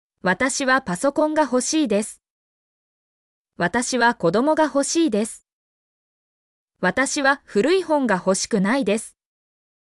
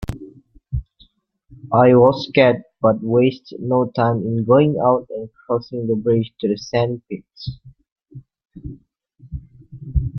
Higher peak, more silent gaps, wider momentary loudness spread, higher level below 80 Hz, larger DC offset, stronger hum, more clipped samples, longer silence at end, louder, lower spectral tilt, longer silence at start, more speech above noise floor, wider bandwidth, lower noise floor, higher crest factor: second, -8 dBFS vs 0 dBFS; first, 2.30-3.45 s, 5.53-6.68 s vs 7.92-7.96 s; second, 6 LU vs 22 LU; second, -58 dBFS vs -38 dBFS; neither; neither; neither; first, 0.9 s vs 0 s; about the same, -20 LUFS vs -18 LUFS; second, -4 dB/octave vs -8 dB/octave; first, 0.25 s vs 0 s; first, over 70 dB vs 39 dB; first, 13.5 kHz vs 6.4 kHz; first, under -90 dBFS vs -56 dBFS; about the same, 16 dB vs 18 dB